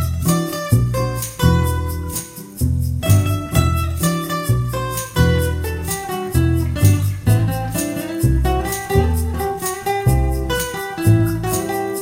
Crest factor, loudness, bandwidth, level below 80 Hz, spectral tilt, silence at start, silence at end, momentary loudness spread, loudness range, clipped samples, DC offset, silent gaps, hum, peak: 16 dB; -19 LUFS; 17 kHz; -26 dBFS; -5.5 dB/octave; 0 s; 0 s; 7 LU; 1 LU; under 0.1%; under 0.1%; none; none; 0 dBFS